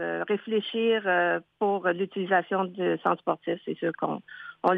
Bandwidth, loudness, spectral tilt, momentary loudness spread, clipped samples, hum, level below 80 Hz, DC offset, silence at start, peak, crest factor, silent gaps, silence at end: 5 kHz; -27 LUFS; -8 dB/octave; 8 LU; under 0.1%; none; -80 dBFS; under 0.1%; 0 s; -10 dBFS; 18 dB; none; 0 s